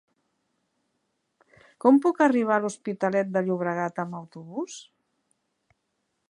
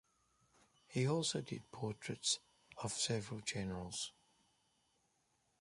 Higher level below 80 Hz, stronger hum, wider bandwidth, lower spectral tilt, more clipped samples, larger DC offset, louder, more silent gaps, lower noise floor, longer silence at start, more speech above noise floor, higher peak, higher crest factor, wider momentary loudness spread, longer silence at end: second, -80 dBFS vs -70 dBFS; neither; about the same, 11 kHz vs 11.5 kHz; first, -6.5 dB/octave vs -3.5 dB/octave; neither; neither; first, -25 LUFS vs -41 LUFS; neither; about the same, -77 dBFS vs -80 dBFS; first, 1.85 s vs 0.9 s; first, 53 dB vs 39 dB; first, -6 dBFS vs -22 dBFS; about the same, 22 dB vs 20 dB; first, 17 LU vs 10 LU; about the same, 1.5 s vs 1.5 s